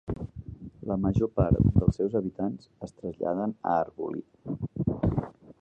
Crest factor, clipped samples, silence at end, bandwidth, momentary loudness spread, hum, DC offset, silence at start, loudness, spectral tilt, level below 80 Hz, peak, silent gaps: 20 dB; under 0.1%; 0.1 s; 8 kHz; 17 LU; none; under 0.1%; 0.05 s; -29 LUFS; -10.5 dB/octave; -40 dBFS; -8 dBFS; none